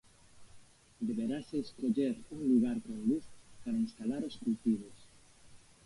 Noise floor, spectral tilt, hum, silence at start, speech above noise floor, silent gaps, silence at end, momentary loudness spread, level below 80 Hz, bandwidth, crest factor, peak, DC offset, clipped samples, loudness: -59 dBFS; -7 dB/octave; none; 0.35 s; 25 dB; none; 0.3 s; 8 LU; -66 dBFS; 11.5 kHz; 18 dB; -18 dBFS; under 0.1%; under 0.1%; -35 LUFS